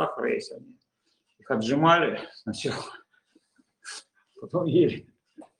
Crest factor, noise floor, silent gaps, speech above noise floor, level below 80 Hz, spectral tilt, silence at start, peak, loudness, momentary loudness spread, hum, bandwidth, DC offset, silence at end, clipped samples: 24 dB; -74 dBFS; none; 48 dB; -70 dBFS; -5.5 dB/octave; 0 s; -6 dBFS; -26 LUFS; 22 LU; none; 11 kHz; under 0.1%; 0.15 s; under 0.1%